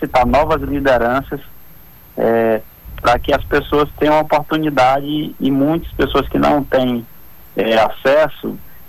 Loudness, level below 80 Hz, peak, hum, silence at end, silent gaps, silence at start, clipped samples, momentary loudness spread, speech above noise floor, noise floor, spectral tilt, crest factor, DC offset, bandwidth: -16 LUFS; -34 dBFS; -6 dBFS; none; 0 s; none; 0 s; under 0.1%; 9 LU; 27 dB; -42 dBFS; -6.5 dB/octave; 10 dB; under 0.1%; 19 kHz